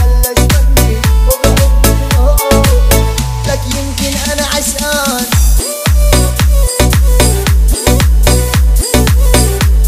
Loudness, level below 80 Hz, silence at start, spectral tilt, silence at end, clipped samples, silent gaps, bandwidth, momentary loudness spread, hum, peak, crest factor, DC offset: -11 LUFS; -10 dBFS; 0 s; -4.5 dB/octave; 0 s; 0.2%; none; 16.5 kHz; 5 LU; none; 0 dBFS; 8 dB; under 0.1%